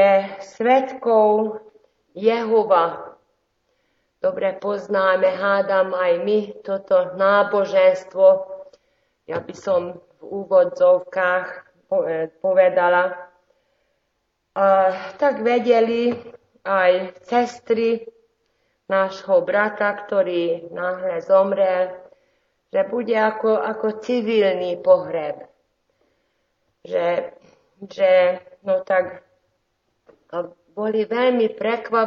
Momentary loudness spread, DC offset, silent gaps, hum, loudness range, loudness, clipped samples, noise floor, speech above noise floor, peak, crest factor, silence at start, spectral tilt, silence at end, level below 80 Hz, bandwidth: 14 LU; under 0.1%; none; none; 4 LU; -20 LUFS; under 0.1%; -72 dBFS; 53 dB; -4 dBFS; 18 dB; 0 s; -3 dB/octave; 0 s; -72 dBFS; 7.2 kHz